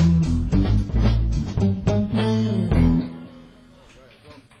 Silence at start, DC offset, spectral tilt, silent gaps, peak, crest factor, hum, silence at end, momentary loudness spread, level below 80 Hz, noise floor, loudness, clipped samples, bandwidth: 0 s; under 0.1%; -8 dB/octave; none; -6 dBFS; 14 dB; none; 0.3 s; 6 LU; -26 dBFS; -49 dBFS; -21 LUFS; under 0.1%; 9.8 kHz